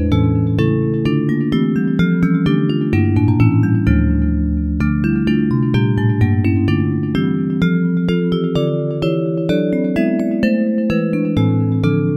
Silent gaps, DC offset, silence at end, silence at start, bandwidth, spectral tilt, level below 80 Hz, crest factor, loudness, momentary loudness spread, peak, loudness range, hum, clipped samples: none; under 0.1%; 0 s; 0 s; 7.4 kHz; -9 dB/octave; -28 dBFS; 14 dB; -16 LUFS; 3 LU; 0 dBFS; 2 LU; none; under 0.1%